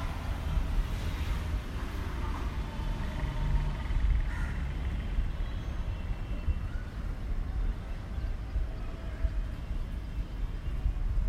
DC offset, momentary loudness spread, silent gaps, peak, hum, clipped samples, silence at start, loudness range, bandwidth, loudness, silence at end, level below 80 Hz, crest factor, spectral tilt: under 0.1%; 6 LU; none; -16 dBFS; none; under 0.1%; 0 s; 3 LU; 13 kHz; -36 LUFS; 0 s; -32 dBFS; 16 dB; -6.5 dB/octave